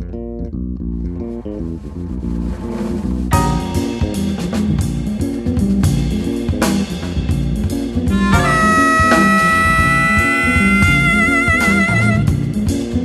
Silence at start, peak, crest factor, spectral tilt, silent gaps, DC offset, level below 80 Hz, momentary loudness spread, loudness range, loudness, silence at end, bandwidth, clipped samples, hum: 0 s; 0 dBFS; 14 dB; -5.5 dB/octave; none; under 0.1%; -26 dBFS; 14 LU; 9 LU; -15 LUFS; 0 s; 13 kHz; under 0.1%; none